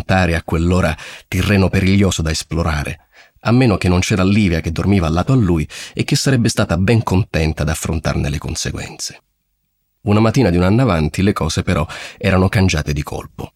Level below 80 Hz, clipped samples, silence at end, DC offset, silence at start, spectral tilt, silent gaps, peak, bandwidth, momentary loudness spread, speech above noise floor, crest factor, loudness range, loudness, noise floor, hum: -30 dBFS; under 0.1%; 0.1 s; under 0.1%; 0 s; -6 dB/octave; none; -2 dBFS; 15 kHz; 10 LU; 52 dB; 14 dB; 3 LU; -16 LUFS; -68 dBFS; none